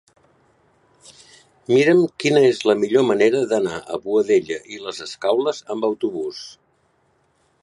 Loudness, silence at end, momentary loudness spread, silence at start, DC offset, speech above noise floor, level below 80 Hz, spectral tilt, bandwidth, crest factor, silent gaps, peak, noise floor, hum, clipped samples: -19 LUFS; 1.1 s; 14 LU; 1.7 s; under 0.1%; 44 dB; -66 dBFS; -5 dB/octave; 11.5 kHz; 18 dB; none; -4 dBFS; -63 dBFS; none; under 0.1%